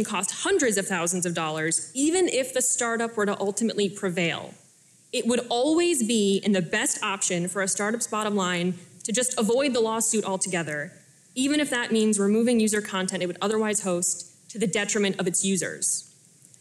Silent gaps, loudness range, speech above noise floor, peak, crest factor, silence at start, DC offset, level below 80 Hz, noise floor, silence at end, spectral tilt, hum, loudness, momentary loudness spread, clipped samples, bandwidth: none; 2 LU; 32 dB; -14 dBFS; 12 dB; 0 s; under 0.1%; -68 dBFS; -57 dBFS; 0.55 s; -3 dB/octave; none; -25 LUFS; 6 LU; under 0.1%; 14 kHz